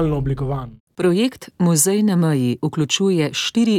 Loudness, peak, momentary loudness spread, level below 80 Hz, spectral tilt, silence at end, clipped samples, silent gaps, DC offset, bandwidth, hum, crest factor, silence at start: -19 LUFS; -4 dBFS; 8 LU; -42 dBFS; -5 dB/octave; 0 s; under 0.1%; 0.80-0.87 s; under 0.1%; 16.5 kHz; none; 14 dB; 0 s